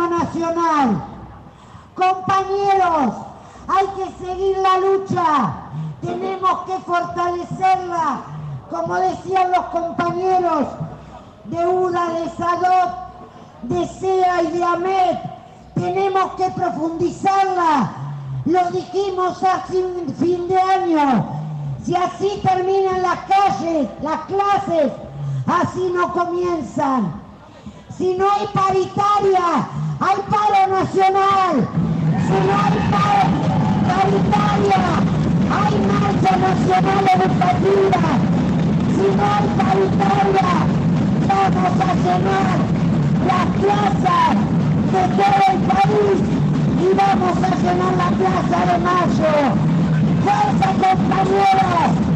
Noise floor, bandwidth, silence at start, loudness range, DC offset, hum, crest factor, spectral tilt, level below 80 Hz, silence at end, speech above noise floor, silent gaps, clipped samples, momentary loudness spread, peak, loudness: -41 dBFS; 9 kHz; 0 s; 4 LU; under 0.1%; none; 10 dB; -7 dB/octave; -42 dBFS; 0 s; 25 dB; none; under 0.1%; 8 LU; -8 dBFS; -17 LUFS